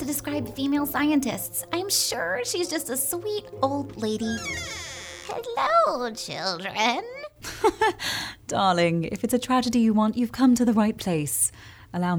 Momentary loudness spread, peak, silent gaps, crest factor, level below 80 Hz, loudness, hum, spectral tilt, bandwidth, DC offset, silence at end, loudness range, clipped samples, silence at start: 10 LU; -8 dBFS; none; 16 dB; -56 dBFS; -25 LUFS; none; -4 dB/octave; over 20 kHz; under 0.1%; 0 s; 4 LU; under 0.1%; 0 s